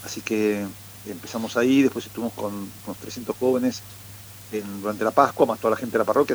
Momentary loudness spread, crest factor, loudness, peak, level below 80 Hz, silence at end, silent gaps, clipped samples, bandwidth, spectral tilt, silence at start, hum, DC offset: 17 LU; 22 dB; -24 LUFS; -2 dBFS; -62 dBFS; 0 s; none; under 0.1%; over 20 kHz; -5 dB/octave; 0 s; none; under 0.1%